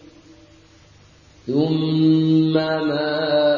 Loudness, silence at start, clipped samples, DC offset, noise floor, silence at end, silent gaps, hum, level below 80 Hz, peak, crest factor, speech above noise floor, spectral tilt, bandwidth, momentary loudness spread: -19 LUFS; 1.45 s; under 0.1%; under 0.1%; -50 dBFS; 0 s; none; none; -58 dBFS; -6 dBFS; 14 dB; 32 dB; -8.5 dB/octave; 7 kHz; 5 LU